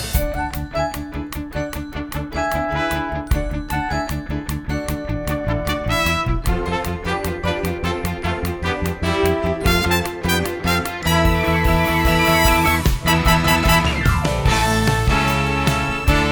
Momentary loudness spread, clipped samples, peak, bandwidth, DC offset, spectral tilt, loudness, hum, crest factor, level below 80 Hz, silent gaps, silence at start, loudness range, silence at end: 10 LU; under 0.1%; -2 dBFS; over 20 kHz; under 0.1%; -5 dB/octave; -19 LUFS; none; 18 dB; -26 dBFS; none; 0 s; 7 LU; 0 s